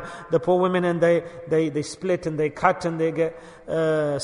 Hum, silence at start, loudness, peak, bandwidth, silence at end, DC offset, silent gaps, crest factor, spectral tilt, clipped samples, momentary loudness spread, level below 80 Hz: none; 0 s; -23 LUFS; -4 dBFS; 11 kHz; 0 s; under 0.1%; none; 20 dB; -6.5 dB/octave; under 0.1%; 6 LU; -58 dBFS